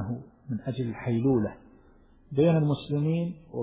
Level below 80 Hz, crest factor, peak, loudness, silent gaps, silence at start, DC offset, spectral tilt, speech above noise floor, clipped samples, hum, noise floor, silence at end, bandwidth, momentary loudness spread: -56 dBFS; 16 dB; -12 dBFS; -28 LUFS; none; 0 s; under 0.1%; -12.5 dB/octave; 30 dB; under 0.1%; none; -57 dBFS; 0 s; 4 kHz; 12 LU